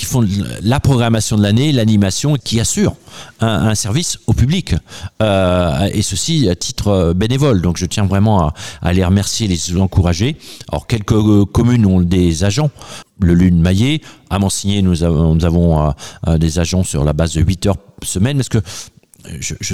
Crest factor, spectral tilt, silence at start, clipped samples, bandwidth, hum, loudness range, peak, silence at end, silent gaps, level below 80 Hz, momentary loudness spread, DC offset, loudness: 14 dB; -5.5 dB/octave; 0 s; under 0.1%; 15.5 kHz; none; 2 LU; 0 dBFS; 0 s; none; -30 dBFS; 9 LU; 1%; -15 LUFS